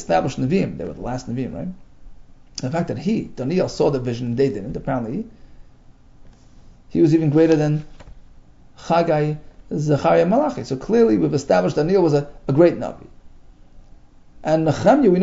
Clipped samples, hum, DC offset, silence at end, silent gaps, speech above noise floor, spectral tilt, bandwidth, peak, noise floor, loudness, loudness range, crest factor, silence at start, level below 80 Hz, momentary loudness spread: under 0.1%; none; under 0.1%; 0 s; none; 28 dB; -7.5 dB/octave; 7.8 kHz; -2 dBFS; -47 dBFS; -20 LUFS; 6 LU; 18 dB; 0 s; -44 dBFS; 14 LU